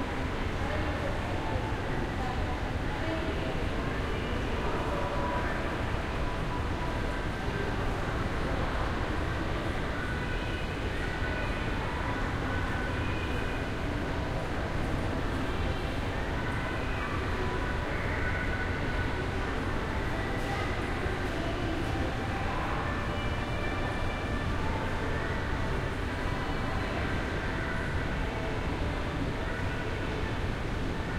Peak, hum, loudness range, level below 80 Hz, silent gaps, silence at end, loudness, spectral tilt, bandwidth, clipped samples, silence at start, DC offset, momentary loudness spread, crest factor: -16 dBFS; none; 1 LU; -36 dBFS; none; 0 s; -33 LUFS; -6 dB/octave; 15 kHz; under 0.1%; 0 s; under 0.1%; 2 LU; 16 dB